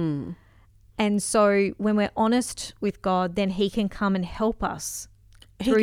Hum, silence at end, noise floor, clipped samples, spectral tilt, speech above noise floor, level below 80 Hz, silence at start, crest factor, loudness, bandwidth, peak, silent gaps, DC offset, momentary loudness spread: none; 0 s; -55 dBFS; under 0.1%; -5 dB/octave; 30 dB; -48 dBFS; 0 s; 16 dB; -25 LUFS; 15.5 kHz; -8 dBFS; none; under 0.1%; 12 LU